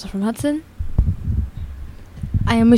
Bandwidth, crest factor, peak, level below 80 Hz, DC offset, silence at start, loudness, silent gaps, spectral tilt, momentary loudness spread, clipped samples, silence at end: 14 kHz; 18 dB; -2 dBFS; -26 dBFS; under 0.1%; 0 s; -22 LUFS; none; -7.5 dB/octave; 15 LU; under 0.1%; 0 s